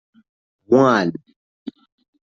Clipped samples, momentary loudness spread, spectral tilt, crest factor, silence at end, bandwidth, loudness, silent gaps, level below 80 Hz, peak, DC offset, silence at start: under 0.1%; 23 LU; -6.5 dB/octave; 20 dB; 1.05 s; 7.4 kHz; -17 LUFS; none; -64 dBFS; -2 dBFS; under 0.1%; 0.7 s